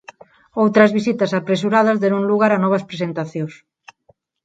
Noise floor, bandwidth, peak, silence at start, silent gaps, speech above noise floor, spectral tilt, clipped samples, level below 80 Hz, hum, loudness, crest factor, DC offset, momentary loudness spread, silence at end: -59 dBFS; 7.8 kHz; 0 dBFS; 0.55 s; none; 42 dB; -7 dB/octave; under 0.1%; -64 dBFS; none; -17 LUFS; 18 dB; under 0.1%; 12 LU; 0.9 s